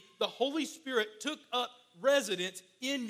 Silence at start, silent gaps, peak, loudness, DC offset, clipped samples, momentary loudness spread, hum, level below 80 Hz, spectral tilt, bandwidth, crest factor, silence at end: 0.2 s; none; -16 dBFS; -34 LUFS; under 0.1%; under 0.1%; 10 LU; none; -90 dBFS; -2.5 dB/octave; 15.5 kHz; 18 dB; 0 s